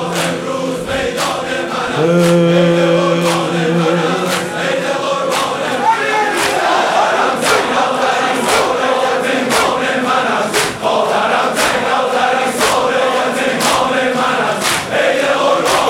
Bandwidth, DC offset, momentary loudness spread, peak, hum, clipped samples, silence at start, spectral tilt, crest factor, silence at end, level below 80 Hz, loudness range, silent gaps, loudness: 16.5 kHz; under 0.1%; 5 LU; 0 dBFS; none; under 0.1%; 0 s; -4 dB/octave; 14 dB; 0 s; -48 dBFS; 1 LU; none; -14 LUFS